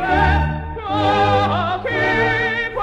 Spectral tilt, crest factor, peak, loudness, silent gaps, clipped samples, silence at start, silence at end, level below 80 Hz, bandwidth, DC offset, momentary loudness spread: -6.5 dB/octave; 14 dB; -4 dBFS; -18 LUFS; none; under 0.1%; 0 s; 0 s; -28 dBFS; 8.8 kHz; under 0.1%; 7 LU